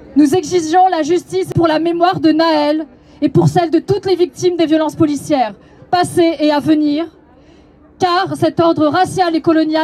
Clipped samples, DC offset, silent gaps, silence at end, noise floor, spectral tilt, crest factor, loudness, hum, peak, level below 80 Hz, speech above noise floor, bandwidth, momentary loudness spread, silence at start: under 0.1%; under 0.1%; none; 0 s; -44 dBFS; -6 dB/octave; 14 dB; -14 LUFS; none; 0 dBFS; -52 dBFS; 31 dB; 14 kHz; 5 LU; 0 s